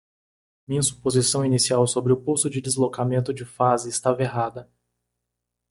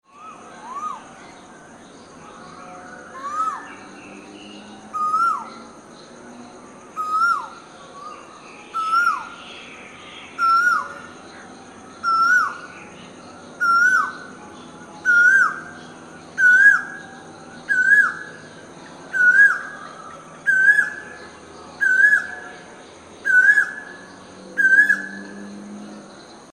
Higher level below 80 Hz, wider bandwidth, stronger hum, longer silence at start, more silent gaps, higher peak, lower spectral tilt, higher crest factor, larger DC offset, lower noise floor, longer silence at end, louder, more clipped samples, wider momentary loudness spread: first, -58 dBFS vs -66 dBFS; about the same, 11.5 kHz vs 12.5 kHz; first, 60 Hz at -40 dBFS vs none; first, 0.7 s vs 0.2 s; neither; about the same, -4 dBFS vs -4 dBFS; first, -4.5 dB/octave vs -2 dB/octave; about the same, 20 dB vs 18 dB; neither; first, -82 dBFS vs -43 dBFS; first, 1.05 s vs 0.5 s; second, -22 LUFS vs -17 LUFS; neither; second, 8 LU vs 26 LU